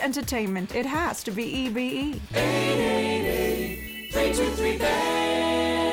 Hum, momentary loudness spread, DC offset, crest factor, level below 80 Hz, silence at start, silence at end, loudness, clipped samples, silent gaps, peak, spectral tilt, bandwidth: none; 6 LU; under 0.1%; 12 dB; -42 dBFS; 0 s; 0 s; -25 LUFS; under 0.1%; none; -14 dBFS; -4.5 dB/octave; 19 kHz